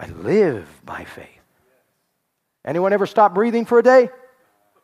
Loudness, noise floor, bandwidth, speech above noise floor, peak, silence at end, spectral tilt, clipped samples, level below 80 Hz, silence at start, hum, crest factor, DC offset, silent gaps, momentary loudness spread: -17 LUFS; -74 dBFS; 12 kHz; 57 dB; -2 dBFS; 0.75 s; -7 dB/octave; under 0.1%; -60 dBFS; 0 s; none; 18 dB; under 0.1%; none; 21 LU